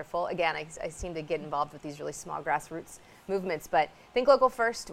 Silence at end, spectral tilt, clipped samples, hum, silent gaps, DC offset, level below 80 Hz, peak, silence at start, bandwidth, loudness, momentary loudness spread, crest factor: 0 s; -4 dB/octave; under 0.1%; none; none; under 0.1%; -54 dBFS; -8 dBFS; 0 s; 15.5 kHz; -30 LUFS; 15 LU; 22 dB